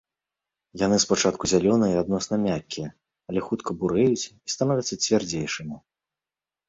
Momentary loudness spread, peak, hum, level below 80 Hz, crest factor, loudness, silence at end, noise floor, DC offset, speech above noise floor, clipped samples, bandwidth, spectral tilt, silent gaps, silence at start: 13 LU; -6 dBFS; none; -54 dBFS; 18 dB; -24 LUFS; 0.9 s; under -90 dBFS; under 0.1%; over 66 dB; under 0.1%; 8 kHz; -4.5 dB/octave; none; 0.75 s